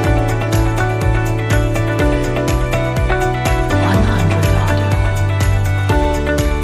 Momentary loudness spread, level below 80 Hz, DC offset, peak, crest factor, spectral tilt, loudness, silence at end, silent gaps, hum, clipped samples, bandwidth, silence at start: 3 LU; -20 dBFS; under 0.1%; -2 dBFS; 12 dB; -6.5 dB/octave; -16 LUFS; 0 s; none; none; under 0.1%; 15 kHz; 0 s